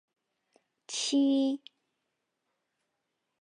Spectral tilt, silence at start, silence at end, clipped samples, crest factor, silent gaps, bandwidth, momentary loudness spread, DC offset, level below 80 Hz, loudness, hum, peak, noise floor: -2 dB/octave; 0.9 s; 1.85 s; under 0.1%; 16 dB; none; 11 kHz; 12 LU; under 0.1%; under -90 dBFS; -29 LUFS; none; -18 dBFS; -83 dBFS